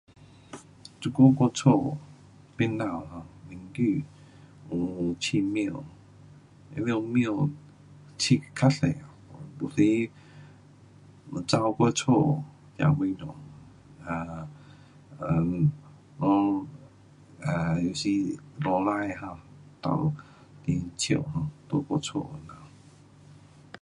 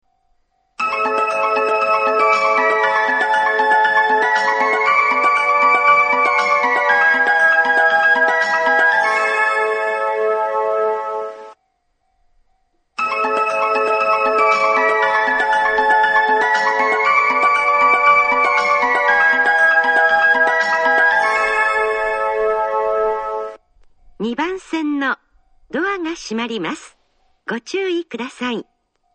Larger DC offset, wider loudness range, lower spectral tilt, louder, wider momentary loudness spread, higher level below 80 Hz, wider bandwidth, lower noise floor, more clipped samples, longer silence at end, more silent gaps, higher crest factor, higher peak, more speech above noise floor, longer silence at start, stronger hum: neither; second, 5 LU vs 10 LU; first, -6 dB/octave vs -3 dB/octave; second, -27 LUFS vs -15 LUFS; first, 22 LU vs 11 LU; about the same, -56 dBFS vs -56 dBFS; first, 11 kHz vs 9.4 kHz; second, -53 dBFS vs -66 dBFS; neither; first, 1.15 s vs 0.55 s; neither; first, 22 dB vs 16 dB; second, -6 dBFS vs 0 dBFS; second, 27 dB vs 43 dB; second, 0.5 s vs 0.8 s; neither